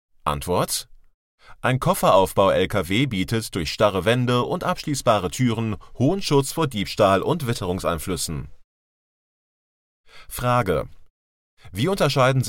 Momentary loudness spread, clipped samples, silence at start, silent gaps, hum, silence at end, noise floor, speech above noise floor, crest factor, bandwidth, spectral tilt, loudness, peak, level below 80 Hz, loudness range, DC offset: 9 LU; under 0.1%; 0.25 s; 1.14-1.38 s, 8.64-10.04 s, 11.10-11.57 s; none; 0 s; under -90 dBFS; over 69 dB; 20 dB; 17 kHz; -5 dB/octave; -22 LUFS; -4 dBFS; -44 dBFS; 8 LU; under 0.1%